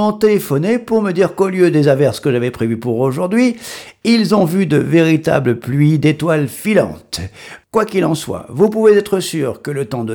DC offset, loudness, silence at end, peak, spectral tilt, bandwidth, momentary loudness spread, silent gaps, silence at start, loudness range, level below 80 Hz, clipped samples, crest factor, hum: under 0.1%; -15 LUFS; 0 s; 0 dBFS; -6.5 dB/octave; over 20 kHz; 9 LU; none; 0 s; 2 LU; -50 dBFS; under 0.1%; 14 dB; none